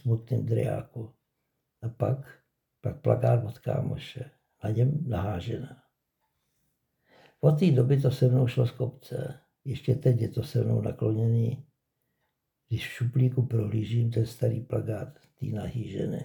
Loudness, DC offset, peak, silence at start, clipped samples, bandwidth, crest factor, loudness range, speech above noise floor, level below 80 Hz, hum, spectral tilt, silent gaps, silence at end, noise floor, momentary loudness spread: -28 LUFS; under 0.1%; -8 dBFS; 0.05 s; under 0.1%; 18 kHz; 20 dB; 5 LU; 53 dB; -56 dBFS; none; -8.5 dB/octave; none; 0 s; -80 dBFS; 15 LU